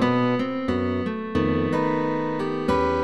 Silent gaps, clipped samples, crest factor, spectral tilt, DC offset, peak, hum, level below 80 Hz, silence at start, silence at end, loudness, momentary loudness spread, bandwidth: none; under 0.1%; 14 dB; -7.5 dB/octave; 0.6%; -8 dBFS; none; -46 dBFS; 0 s; 0 s; -24 LUFS; 4 LU; 11.5 kHz